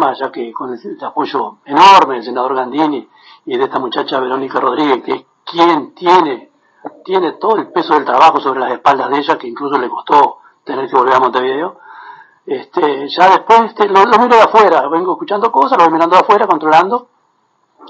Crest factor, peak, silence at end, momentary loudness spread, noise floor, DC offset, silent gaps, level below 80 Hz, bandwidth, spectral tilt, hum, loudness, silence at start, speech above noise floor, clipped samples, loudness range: 12 dB; 0 dBFS; 0.85 s; 14 LU; -59 dBFS; under 0.1%; none; -68 dBFS; 8.2 kHz; -4.5 dB/octave; none; -12 LUFS; 0 s; 47 dB; 0.1%; 5 LU